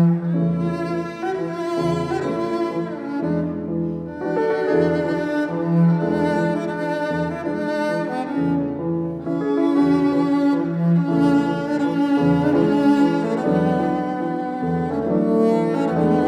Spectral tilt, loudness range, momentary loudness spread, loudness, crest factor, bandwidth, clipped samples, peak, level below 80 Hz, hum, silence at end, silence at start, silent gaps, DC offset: -8.5 dB/octave; 5 LU; 7 LU; -21 LUFS; 14 dB; 9.4 kHz; under 0.1%; -6 dBFS; -52 dBFS; none; 0 s; 0 s; none; under 0.1%